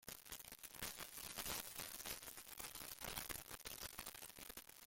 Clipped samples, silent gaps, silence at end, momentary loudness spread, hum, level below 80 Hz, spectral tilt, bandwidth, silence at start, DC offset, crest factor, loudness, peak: under 0.1%; none; 0 s; 7 LU; none; -68 dBFS; -1 dB/octave; 17 kHz; 0 s; under 0.1%; 26 dB; -50 LUFS; -26 dBFS